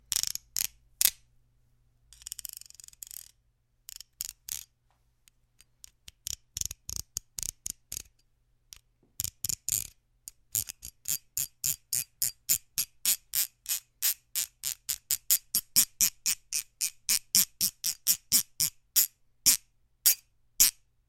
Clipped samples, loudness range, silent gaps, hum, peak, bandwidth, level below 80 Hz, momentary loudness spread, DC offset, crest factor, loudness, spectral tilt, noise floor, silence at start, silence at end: under 0.1%; 16 LU; none; none; 0 dBFS; 17 kHz; -60 dBFS; 18 LU; under 0.1%; 34 dB; -28 LUFS; 1.5 dB/octave; -71 dBFS; 0.1 s; 0.35 s